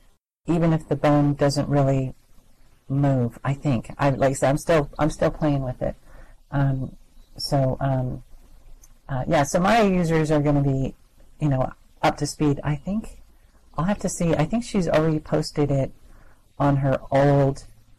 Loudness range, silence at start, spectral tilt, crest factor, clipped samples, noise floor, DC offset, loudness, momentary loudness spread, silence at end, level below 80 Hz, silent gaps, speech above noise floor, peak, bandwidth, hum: 4 LU; 0.45 s; -6.5 dB/octave; 10 dB; under 0.1%; -52 dBFS; under 0.1%; -23 LUFS; 11 LU; 0.3 s; -40 dBFS; none; 31 dB; -12 dBFS; 13 kHz; none